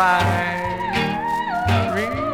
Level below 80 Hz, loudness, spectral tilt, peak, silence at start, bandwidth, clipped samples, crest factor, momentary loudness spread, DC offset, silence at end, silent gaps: -42 dBFS; -21 LUFS; -5.5 dB/octave; -4 dBFS; 0 s; 16.5 kHz; under 0.1%; 16 dB; 5 LU; under 0.1%; 0 s; none